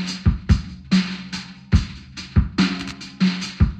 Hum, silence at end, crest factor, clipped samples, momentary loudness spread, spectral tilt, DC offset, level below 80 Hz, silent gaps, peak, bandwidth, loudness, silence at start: none; 0 s; 16 dB; under 0.1%; 12 LU; -6 dB/octave; under 0.1%; -26 dBFS; none; -4 dBFS; 9 kHz; -22 LUFS; 0 s